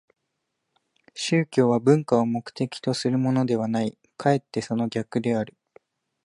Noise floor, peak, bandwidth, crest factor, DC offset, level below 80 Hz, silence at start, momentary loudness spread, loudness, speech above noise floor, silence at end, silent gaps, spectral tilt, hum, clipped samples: -79 dBFS; -6 dBFS; 11.5 kHz; 20 dB; under 0.1%; -68 dBFS; 1.15 s; 9 LU; -24 LUFS; 56 dB; 0.75 s; none; -6.5 dB/octave; none; under 0.1%